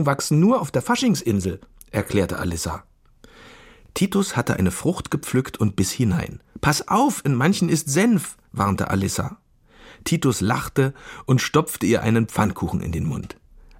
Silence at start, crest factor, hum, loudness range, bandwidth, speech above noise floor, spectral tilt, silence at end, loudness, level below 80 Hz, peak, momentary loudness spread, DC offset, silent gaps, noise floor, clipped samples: 0 s; 20 dB; none; 4 LU; 16.5 kHz; 30 dB; -5.5 dB/octave; 0.5 s; -22 LUFS; -44 dBFS; -2 dBFS; 10 LU; under 0.1%; none; -51 dBFS; under 0.1%